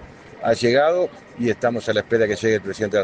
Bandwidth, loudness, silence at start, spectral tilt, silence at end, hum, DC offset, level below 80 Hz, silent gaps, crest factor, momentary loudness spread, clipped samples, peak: 9.4 kHz; -21 LUFS; 0 s; -5.5 dB/octave; 0 s; none; under 0.1%; -56 dBFS; none; 16 dB; 8 LU; under 0.1%; -4 dBFS